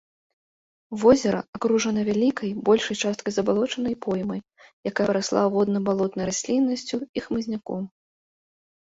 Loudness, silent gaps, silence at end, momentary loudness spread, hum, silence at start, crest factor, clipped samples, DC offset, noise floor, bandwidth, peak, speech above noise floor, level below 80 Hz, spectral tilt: -24 LUFS; 1.48-1.53 s, 4.73-4.83 s, 7.09-7.14 s; 0.95 s; 9 LU; none; 0.9 s; 20 dB; under 0.1%; under 0.1%; under -90 dBFS; 8 kHz; -6 dBFS; over 67 dB; -58 dBFS; -5 dB/octave